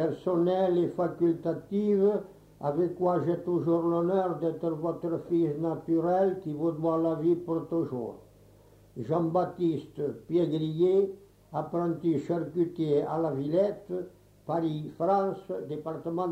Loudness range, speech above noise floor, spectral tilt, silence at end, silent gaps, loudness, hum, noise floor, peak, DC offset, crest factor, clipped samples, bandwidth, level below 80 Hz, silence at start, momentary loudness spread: 3 LU; 28 dB; -9.5 dB/octave; 0 s; none; -29 LUFS; none; -57 dBFS; -14 dBFS; under 0.1%; 14 dB; under 0.1%; 7.8 kHz; -66 dBFS; 0 s; 10 LU